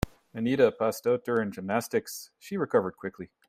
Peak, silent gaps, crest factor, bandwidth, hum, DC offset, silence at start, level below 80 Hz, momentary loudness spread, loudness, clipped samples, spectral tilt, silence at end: -8 dBFS; none; 22 dB; 16 kHz; none; under 0.1%; 0 s; -52 dBFS; 15 LU; -28 LUFS; under 0.1%; -5.5 dB/octave; 0.25 s